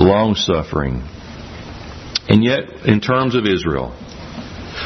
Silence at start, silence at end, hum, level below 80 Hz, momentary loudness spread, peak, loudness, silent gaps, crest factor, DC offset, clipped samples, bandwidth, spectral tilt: 0 s; 0 s; none; -36 dBFS; 19 LU; 0 dBFS; -17 LUFS; none; 18 dB; under 0.1%; under 0.1%; 6.4 kHz; -6 dB/octave